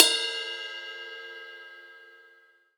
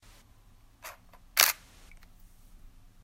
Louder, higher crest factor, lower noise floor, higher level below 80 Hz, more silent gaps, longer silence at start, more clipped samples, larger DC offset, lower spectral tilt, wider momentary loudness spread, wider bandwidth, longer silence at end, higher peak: second, -29 LUFS vs -26 LUFS; about the same, 30 dB vs 34 dB; about the same, -60 dBFS vs -58 dBFS; second, under -90 dBFS vs -56 dBFS; neither; second, 0 s vs 0.85 s; neither; neither; second, 4 dB/octave vs 2 dB/octave; second, 21 LU vs 24 LU; first, over 20 kHz vs 16 kHz; second, 0.6 s vs 1.5 s; about the same, 0 dBFS vs -2 dBFS